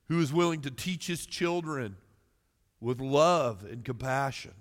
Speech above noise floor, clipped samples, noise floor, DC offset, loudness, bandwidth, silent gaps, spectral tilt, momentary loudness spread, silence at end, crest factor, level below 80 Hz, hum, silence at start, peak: 43 dB; under 0.1%; -72 dBFS; under 0.1%; -30 LUFS; 16.5 kHz; none; -5.5 dB/octave; 13 LU; 0 s; 20 dB; -62 dBFS; none; 0.1 s; -10 dBFS